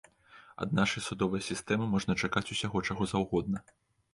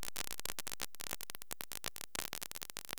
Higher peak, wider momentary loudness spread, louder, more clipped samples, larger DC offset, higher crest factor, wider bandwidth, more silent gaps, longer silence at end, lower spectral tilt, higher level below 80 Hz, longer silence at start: about the same, -14 dBFS vs -16 dBFS; first, 7 LU vs 3 LU; first, -32 LUFS vs -43 LUFS; neither; second, under 0.1% vs 0.5%; second, 18 dB vs 30 dB; second, 11.5 kHz vs over 20 kHz; neither; first, 0.55 s vs 0 s; first, -5 dB/octave vs -0.5 dB/octave; first, -56 dBFS vs -66 dBFS; first, 0.35 s vs 0 s